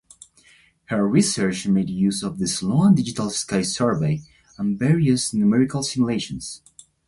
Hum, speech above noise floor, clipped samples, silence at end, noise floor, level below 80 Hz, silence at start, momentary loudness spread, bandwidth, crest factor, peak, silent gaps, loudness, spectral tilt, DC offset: none; 35 dB; under 0.1%; 0.5 s; -55 dBFS; -52 dBFS; 0.9 s; 9 LU; 11.5 kHz; 16 dB; -4 dBFS; none; -21 LUFS; -5.5 dB/octave; under 0.1%